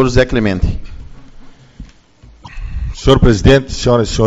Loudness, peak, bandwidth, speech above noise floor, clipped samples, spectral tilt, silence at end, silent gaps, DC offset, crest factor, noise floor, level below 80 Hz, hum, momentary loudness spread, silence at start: -13 LUFS; 0 dBFS; 8 kHz; 32 dB; 0.3%; -6 dB/octave; 0 s; none; under 0.1%; 14 dB; -43 dBFS; -22 dBFS; none; 18 LU; 0 s